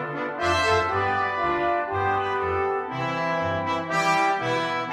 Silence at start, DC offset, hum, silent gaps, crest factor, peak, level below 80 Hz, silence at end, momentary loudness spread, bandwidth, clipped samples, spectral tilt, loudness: 0 s; under 0.1%; none; none; 16 dB; -10 dBFS; -52 dBFS; 0 s; 5 LU; 15 kHz; under 0.1%; -4.5 dB/octave; -24 LUFS